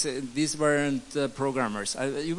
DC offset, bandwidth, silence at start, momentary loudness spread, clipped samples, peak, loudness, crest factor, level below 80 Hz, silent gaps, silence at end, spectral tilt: under 0.1%; 11.5 kHz; 0 s; 5 LU; under 0.1%; -12 dBFS; -28 LUFS; 16 dB; -58 dBFS; none; 0 s; -4 dB/octave